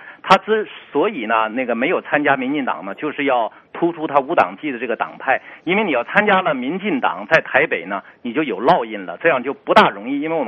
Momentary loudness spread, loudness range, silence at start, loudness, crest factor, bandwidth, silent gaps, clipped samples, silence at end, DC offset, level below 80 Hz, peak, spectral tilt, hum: 9 LU; 2 LU; 0 s; -18 LUFS; 18 dB; 8 kHz; none; under 0.1%; 0 s; under 0.1%; -62 dBFS; 0 dBFS; -2.5 dB/octave; none